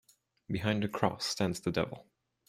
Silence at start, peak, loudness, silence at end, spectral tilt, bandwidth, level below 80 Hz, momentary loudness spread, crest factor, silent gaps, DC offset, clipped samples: 0.5 s; -12 dBFS; -33 LUFS; 0.5 s; -5 dB/octave; 16 kHz; -62 dBFS; 7 LU; 22 dB; none; under 0.1%; under 0.1%